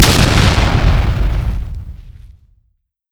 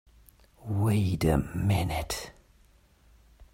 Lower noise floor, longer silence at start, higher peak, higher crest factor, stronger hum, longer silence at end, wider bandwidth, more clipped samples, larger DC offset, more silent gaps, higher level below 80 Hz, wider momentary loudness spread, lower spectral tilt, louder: about the same, -62 dBFS vs -61 dBFS; second, 0 s vs 0.6 s; first, 0 dBFS vs -10 dBFS; second, 14 dB vs 20 dB; neither; first, 0.85 s vs 0.1 s; first, over 20 kHz vs 16 kHz; first, 0.1% vs under 0.1%; neither; neither; first, -18 dBFS vs -44 dBFS; first, 18 LU vs 11 LU; second, -4.5 dB/octave vs -6.5 dB/octave; first, -14 LUFS vs -28 LUFS